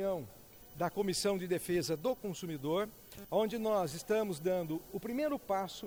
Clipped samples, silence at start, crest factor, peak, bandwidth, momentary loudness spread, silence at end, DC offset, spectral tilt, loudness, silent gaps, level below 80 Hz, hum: under 0.1%; 0 s; 16 dB; -20 dBFS; over 20 kHz; 8 LU; 0 s; under 0.1%; -5 dB/octave; -36 LUFS; none; -64 dBFS; none